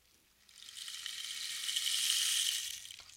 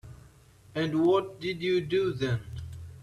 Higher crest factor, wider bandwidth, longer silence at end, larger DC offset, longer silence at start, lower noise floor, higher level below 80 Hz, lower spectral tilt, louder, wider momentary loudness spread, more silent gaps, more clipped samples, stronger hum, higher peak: first, 22 dB vs 16 dB; first, 16.5 kHz vs 12 kHz; about the same, 0 s vs 0 s; neither; first, 0.5 s vs 0.05 s; first, -67 dBFS vs -56 dBFS; second, -78 dBFS vs -56 dBFS; second, 5 dB/octave vs -7 dB/octave; second, -34 LUFS vs -29 LUFS; about the same, 16 LU vs 16 LU; neither; neither; neither; about the same, -16 dBFS vs -14 dBFS